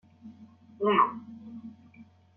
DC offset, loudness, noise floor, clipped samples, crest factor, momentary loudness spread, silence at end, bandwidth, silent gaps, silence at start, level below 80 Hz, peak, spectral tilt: under 0.1%; -26 LUFS; -55 dBFS; under 0.1%; 22 dB; 26 LU; 0.35 s; 4.2 kHz; none; 0.25 s; -80 dBFS; -10 dBFS; -3.5 dB/octave